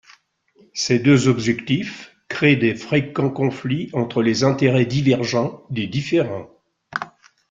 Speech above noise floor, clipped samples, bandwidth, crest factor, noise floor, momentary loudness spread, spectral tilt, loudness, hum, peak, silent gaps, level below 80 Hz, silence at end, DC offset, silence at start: 38 dB; under 0.1%; 7.8 kHz; 18 dB; -57 dBFS; 14 LU; -6 dB/octave; -20 LUFS; none; -2 dBFS; none; -56 dBFS; 0.4 s; under 0.1%; 0.75 s